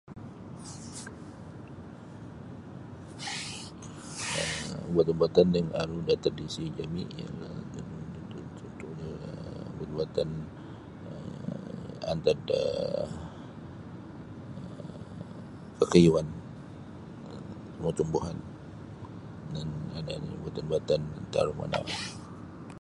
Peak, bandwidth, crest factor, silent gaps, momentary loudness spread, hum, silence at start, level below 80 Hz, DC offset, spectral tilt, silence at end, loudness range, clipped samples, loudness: -6 dBFS; 11.5 kHz; 28 dB; none; 17 LU; none; 0.05 s; -54 dBFS; under 0.1%; -6 dB/octave; 0 s; 10 LU; under 0.1%; -31 LUFS